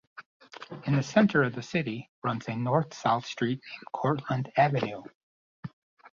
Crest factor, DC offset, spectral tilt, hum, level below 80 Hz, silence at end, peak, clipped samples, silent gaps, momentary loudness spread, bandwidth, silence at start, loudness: 20 dB; under 0.1%; -6.5 dB/octave; none; -66 dBFS; 0.05 s; -10 dBFS; under 0.1%; 0.26-0.40 s, 2.09-2.22 s, 5.15-5.63 s, 5.73-5.97 s; 20 LU; 7.4 kHz; 0.15 s; -28 LUFS